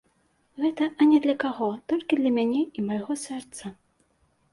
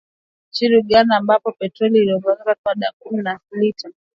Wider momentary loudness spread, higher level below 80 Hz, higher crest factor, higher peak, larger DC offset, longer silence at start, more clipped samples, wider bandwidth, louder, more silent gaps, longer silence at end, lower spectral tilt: first, 16 LU vs 11 LU; second, -68 dBFS vs -60 dBFS; about the same, 16 dB vs 18 dB; second, -10 dBFS vs 0 dBFS; neither; about the same, 0.55 s vs 0.55 s; neither; first, 11.5 kHz vs 7.2 kHz; second, -25 LUFS vs -18 LUFS; second, none vs 2.58-2.64 s, 2.93-3.00 s; first, 0.8 s vs 0.25 s; second, -5 dB/octave vs -6.5 dB/octave